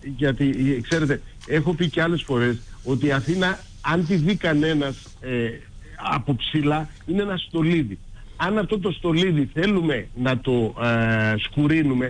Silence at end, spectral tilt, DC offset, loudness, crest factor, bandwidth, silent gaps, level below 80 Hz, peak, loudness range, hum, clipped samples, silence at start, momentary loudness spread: 0 s; -6.5 dB/octave; under 0.1%; -23 LUFS; 12 dB; 10 kHz; none; -42 dBFS; -10 dBFS; 3 LU; none; under 0.1%; 0 s; 7 LU